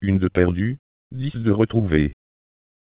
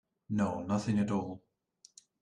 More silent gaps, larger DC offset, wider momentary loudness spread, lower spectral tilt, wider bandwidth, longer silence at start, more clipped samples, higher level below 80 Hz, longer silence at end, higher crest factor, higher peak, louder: first, 0.79-1.10 s vs none; neither; about the same, 11 LU vs 11 LU; first, -12 dB/octave vs -7 dB/octave; second, 4 kHz vs 10 kHz; second, 0 s vs 0.3 s; neither; first, -36 dBFS vs -68 dBFS; about the same, 0.85 s vs 0.85 s; about the same, 18 dB vs 16 dB; first, -4 dBFS vs -20 dBFS; first, -21 LUFS vs -34 LUFS